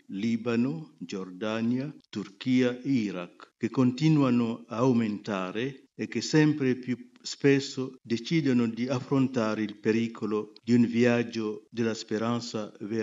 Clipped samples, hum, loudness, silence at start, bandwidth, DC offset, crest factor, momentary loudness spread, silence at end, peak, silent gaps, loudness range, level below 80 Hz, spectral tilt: under 0.1%; none; -28 LUFS; 0.1 s; 7.8 kHz; under 0.1%; 20 dB; 12 LU; 0 s; -8 dBFS; none; 3 LU; -76 dBFS; -6.5 dB/octave